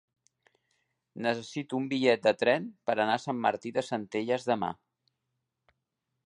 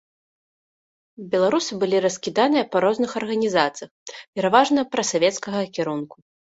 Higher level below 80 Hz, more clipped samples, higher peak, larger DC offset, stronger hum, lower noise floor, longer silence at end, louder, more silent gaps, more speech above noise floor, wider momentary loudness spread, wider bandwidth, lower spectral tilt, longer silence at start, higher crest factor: second, -76 dBFS vs -66 dBFS; neither; second, -10 dBFS vs -2 dBFS; neither; neither; second, -83 dBFS vs under -90 dBFS; first, 1.55 s vs 0.5 s; second, -30 LUFS vs -21 LUFS; second, none vs 3.91-4.06 s, 4.28-4.33 s; second, 54 dB vs over 69 dB; second, 9 LU vs 14 LU; first, 11 kHz vs 8 kHz; about the same, -5 dB/octave vs -4 dB/octave; about the same, 1.15 s vs 1.2 s; about the same, 22 dB vs 20 dB